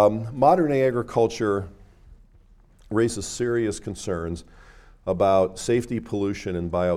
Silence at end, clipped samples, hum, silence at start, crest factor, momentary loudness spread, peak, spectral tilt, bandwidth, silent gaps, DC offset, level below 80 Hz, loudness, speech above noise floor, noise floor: 0 s; under 0.1%; none; 0 s; 20 dB; 10 LU; -4 dBFS; -6 dB/octave; 14.5 kHz; none; under 0.1%; -48 dBFS; -24 LUFS; 31 dB; -53 dBFS